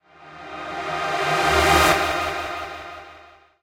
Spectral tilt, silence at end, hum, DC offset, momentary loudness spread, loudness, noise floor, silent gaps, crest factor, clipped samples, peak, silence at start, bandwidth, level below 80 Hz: -3 dB/octave; 0.4 s; none; under 0.1%; 21 LU; -20 LUFS; -49 dBFS; none; 20 dB; under 0.1%; -4 dBFS; 0.2 s; 16 kHz; -40 dBFS